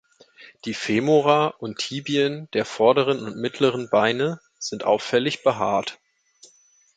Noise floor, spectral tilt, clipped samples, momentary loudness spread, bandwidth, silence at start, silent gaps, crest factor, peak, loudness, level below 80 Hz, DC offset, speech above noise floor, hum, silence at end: -58 dBFS; -5 dB/octave; under 0.1%; 11 LU; 9.2 kHz; 0.4 s; none; 20 dB; -4 dBFS; -22 LUFS; -66 dBFS; under 0.1%; 36 dB; none; 1.05 s